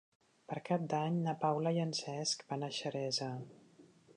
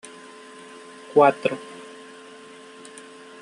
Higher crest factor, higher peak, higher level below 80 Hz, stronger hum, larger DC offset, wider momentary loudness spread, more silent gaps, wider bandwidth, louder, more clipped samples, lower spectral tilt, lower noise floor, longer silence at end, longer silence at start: second, 18 dB vs 24 dB; second, -20 dBFS vs -2 dBFS; second, -84 dBFS vs -74 dBFS; neither; neither; second, 11 LU vs 26 LU; neither; about the same, 11 kHz vs 11.5 kHz; second, -37 LUFS vs -21 LUFS; neither; about the same, -5 dB/octave vs -5 dB/octave; first, -63 dBFS vs -44 dBFS; second, 0.05 s vs 1.6 s; second, 0.5 s vs 1.15 s